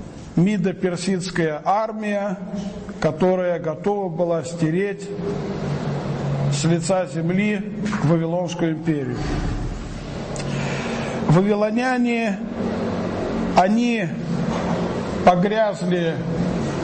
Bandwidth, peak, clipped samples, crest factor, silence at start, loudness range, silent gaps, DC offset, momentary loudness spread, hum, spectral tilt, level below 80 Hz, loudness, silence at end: 8.8 kHz; -2 dBFS; under 0.1%; 20 dB; 0 s; 3 LU; none; under 0.1%; 8 LU; none; -6.5 dB/octave; -40 dBFS; -22 LUFS; 0 s